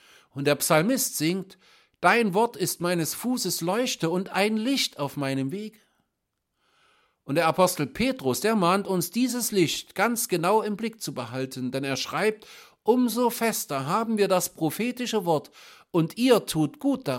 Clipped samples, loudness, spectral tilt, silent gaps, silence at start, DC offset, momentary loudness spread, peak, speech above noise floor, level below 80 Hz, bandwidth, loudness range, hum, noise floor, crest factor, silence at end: under 0.1%; -25 LUFS; -4 dB/octave; none; 0.35 s; under 0.1%; 9 LU; -4 dBFS; 55 dB; -64 dBFS; 17 kHz; 4 LU; none; -80 dBFS; 22 dB; 0 s